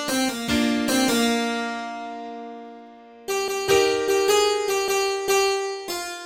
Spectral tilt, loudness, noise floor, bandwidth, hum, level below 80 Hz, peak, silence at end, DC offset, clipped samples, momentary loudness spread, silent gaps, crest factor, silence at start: -2.5 dB/octave; -22 LUFS; -45 dBFS; 17 kHz; none; -54 dBFS; -6 dBFS; 0 s; under 0.1%; under 0.1%; 16 LU; none; 16 dB; 0 s